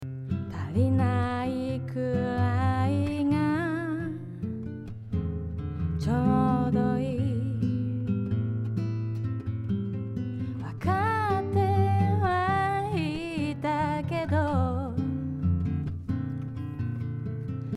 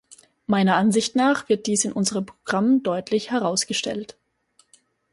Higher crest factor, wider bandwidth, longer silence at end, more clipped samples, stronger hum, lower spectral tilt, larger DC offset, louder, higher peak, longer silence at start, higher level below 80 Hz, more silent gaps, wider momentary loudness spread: about the same, 16 dB vs 18 dB; about the same, 11.5 kHz vs 11.5 kHz; second, 0 s vs 1 s; neither; neither; first, -8.5 dB/octave vs -4 dB/octave; neither; second, -28 LUFS vs -22 LUFS; second, -12 dBFS vs -6 dBFS; about the same, 0 s vs 0.1 s; first, -50 dBFS vs -64 dBFS; neither; about the same, 9 LU vs 10 LU